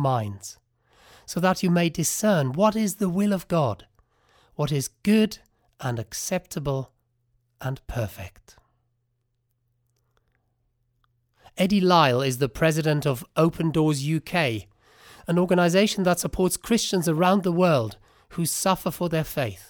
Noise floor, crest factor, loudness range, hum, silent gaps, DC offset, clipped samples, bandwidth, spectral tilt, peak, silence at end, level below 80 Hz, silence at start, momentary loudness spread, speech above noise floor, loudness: -74 dBFS; 20 dB; 12 LU; none; none; under 0.1%; under 0.1%; over 20 kHz; -5 dB/octave; -4 dBFS; 0.1 s; -50 dBFS; 0 s; 14 LU; 51 dB; -24 LUFS